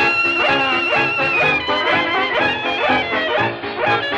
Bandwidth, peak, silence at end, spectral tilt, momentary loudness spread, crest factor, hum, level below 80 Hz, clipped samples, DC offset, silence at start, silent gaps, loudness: 10 kHz; -4 dBFS; 0 s; -4.5 dB/octave; 4 LU; 14 dB; none; -50 dBFS; under 0.1%; under 0.1%; 0 s; none; -16 LUFS